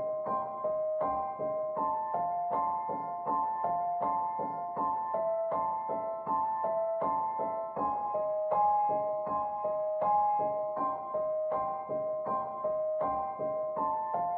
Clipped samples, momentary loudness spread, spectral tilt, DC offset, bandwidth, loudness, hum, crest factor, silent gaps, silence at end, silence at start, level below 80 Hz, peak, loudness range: under 0.1%; 5 LU; -7.5 dB/octave; under 0.1%; 3.4 kHz; -32 LUFS; none; 14 dB; none; 0 s; 0 s; -68 dBFS; -18 dBFS; 2 LU